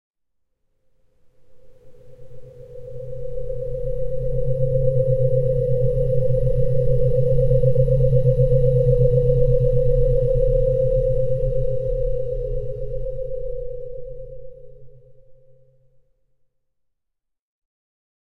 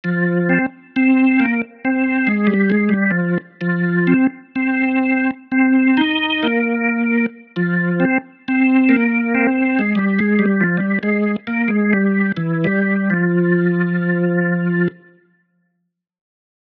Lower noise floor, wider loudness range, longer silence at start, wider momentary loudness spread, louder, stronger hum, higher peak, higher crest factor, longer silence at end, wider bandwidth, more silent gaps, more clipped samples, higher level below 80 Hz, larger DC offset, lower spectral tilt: first, -77 dBFS vs -72 dBFS; first, 17 LU vs 2 LU; first, 1.05 s vs 0.05 s; first, 16 LU vs 6 LU; second, -21 LUFS vs -17 LUFS; neither; about the same, -4 dBFS vs -2 dBFS; about the same, 16 dB vs 14 dB; first, 2.25 s vs 1.7 s; second, 3 kHz vs 4.5 kHz; neither; neither; first, -28 dBFS vs -62 dBFS; neither; first, -11.5 dB/octave vs -10 dB/octave